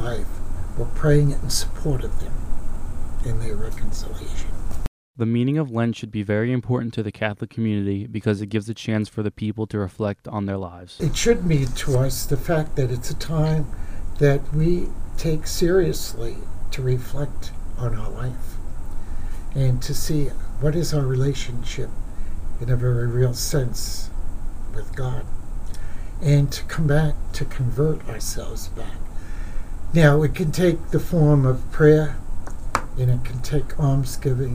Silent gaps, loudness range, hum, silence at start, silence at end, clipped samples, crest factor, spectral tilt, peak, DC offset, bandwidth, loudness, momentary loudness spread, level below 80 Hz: 4.88-5.14 s; 7 LU; none; 0 s; 0 s; under 0.1%; 20 dB; -6.5 dB/octave; 0 dBFS; under 0.1%; 15.5 kHz; -23 LUFS; 17 LU; -28 dBFS